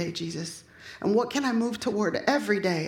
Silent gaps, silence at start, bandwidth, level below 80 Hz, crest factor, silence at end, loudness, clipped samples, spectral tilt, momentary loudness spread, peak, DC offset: none; 0 s; 17 kHz; -64 dBFS; 18 dB; 0 s; -27 LUFS; under 0.1%; -5 dB/octave; 12 LU; -10 dBFS; under 0.1%